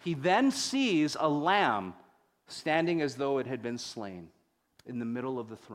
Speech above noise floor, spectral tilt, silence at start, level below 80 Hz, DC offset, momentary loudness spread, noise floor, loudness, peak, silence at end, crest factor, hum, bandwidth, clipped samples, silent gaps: 37 dB; -4.5 dB/octave; 0 s; -74 dBFS; under 0.1%; 16 LU; -67 dBFS; -30 LUFS; -12 dBFS; 0 s; 20 dB; none; 15 kHz; under 0.1%; none